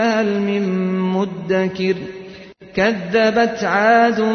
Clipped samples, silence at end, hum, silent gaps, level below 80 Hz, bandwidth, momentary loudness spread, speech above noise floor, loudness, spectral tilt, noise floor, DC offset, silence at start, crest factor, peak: under 0.1%; 0 s; none; none; -54 dBFS; 6.6 kHz; 12 LU; 22 dB; -17 LUFS; -6 dB/octave; -38 dBFS; under 0.1%; 0 s; 14 dB; -4 dBFS